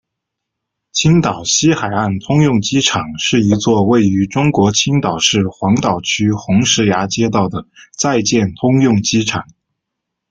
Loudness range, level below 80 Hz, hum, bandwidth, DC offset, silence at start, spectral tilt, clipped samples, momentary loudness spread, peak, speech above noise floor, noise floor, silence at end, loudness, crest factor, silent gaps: 2 LU; -46 dBFS; none; 9.4 kHz; under 0.1%; 0.95 s; -4.5 dB/octave; under 0.1%; 5 LU; 0 dBFS; 64 dB; -78 dBFS; 0.9 s; -14 LUFS; 14 dB; none